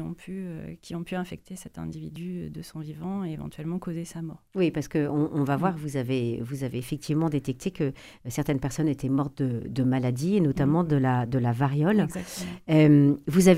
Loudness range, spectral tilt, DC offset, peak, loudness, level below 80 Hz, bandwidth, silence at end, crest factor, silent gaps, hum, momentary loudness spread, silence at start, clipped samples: 12 LU; -7 dB/octave; under 0.1%; -4 dBFS; -27 LUFS; -52 dBFS; 15.5 kHz; 0 s; 22 dB; none; none; 14 LU; 0 s; under 0.1%